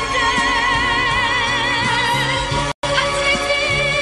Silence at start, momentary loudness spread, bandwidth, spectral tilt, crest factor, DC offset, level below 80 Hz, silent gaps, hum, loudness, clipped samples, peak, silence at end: 0 s; 3 LU; 13 kHz; -3 dB/octave; 12 dB; under 0.1%; -34 dBFS; 2.74-2.82 s; none; -16 LUFS; under 0.1%; -4 dBFS; 0 s